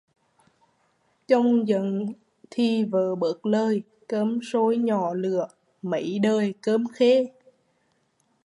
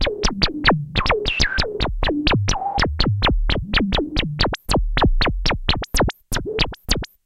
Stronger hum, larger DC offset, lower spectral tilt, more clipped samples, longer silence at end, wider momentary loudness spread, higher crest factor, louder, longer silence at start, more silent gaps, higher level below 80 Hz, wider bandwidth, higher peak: neither; neither; first, -7 dB/octave vs -4.5 dB/octave; neither; first, 1.15 s vs 0.2 s; first, 10 LU vs 4 LU; about the same, 18 dB vs 20 dB; second, -24 LUFS vs -20 LUFS; first, 1.3 s vs 0 s; neither; second, -78 dBFS vs -24 dBFS; second, 11 kHz vs 14.5 kHz; second, -6 dBFS vs 0 dBFS